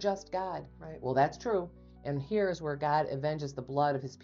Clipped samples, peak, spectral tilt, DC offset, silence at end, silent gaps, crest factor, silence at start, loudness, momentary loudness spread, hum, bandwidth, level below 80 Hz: under 0.1%; -16 dBFS; -5.5 dB/octave; under 0.1%; 0 s; none; 18 dB; 0 s; -33 LUFS; 11 LU; none; 7.6 kHz; -60 dBFS